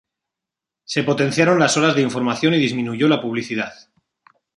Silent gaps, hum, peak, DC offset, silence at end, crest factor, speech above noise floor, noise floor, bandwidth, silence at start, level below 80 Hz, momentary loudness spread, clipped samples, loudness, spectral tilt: none; none; -2 dBFS; under 0.1%; 0.85 s; 18 dB; 68 dB; -86 dBFS; 11.5 kHz; 0.9 s; -62 dBFS; 10 LU; under 0.1%; -18 LUFS; -5 dB/octave